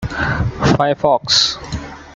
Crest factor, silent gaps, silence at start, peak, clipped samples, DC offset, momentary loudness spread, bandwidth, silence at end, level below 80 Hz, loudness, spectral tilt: 16 dB; none; 0 s; -2 dBFS; under 0.1%; under 0.1%; 14 LU; 9.4 kHz; 0 s; -34 dBFS; -15 LUFS; -4 dB/octave